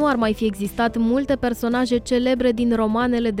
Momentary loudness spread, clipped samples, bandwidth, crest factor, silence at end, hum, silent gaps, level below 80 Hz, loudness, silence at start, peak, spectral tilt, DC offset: 3 LU; under 0.1%; 16 kHz; 12 dB; 0 s; none; none; -42 dBFS; -21 LUFS; 0 s; -8 dBFS; -5.5 dB/octave; under 0.1%